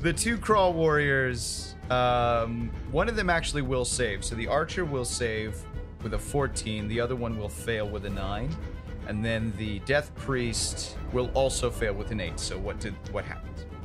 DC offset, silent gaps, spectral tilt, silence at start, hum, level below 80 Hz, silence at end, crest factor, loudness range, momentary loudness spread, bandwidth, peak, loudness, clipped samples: under 0.1%; none; -4.5 dB/octave; 0 s; none; -38 dBFS; 0 s; 18 dB; 6 LU; 11 LU; 15.5 kHz; -10 dBFS; -29 LUFS; under 0.1%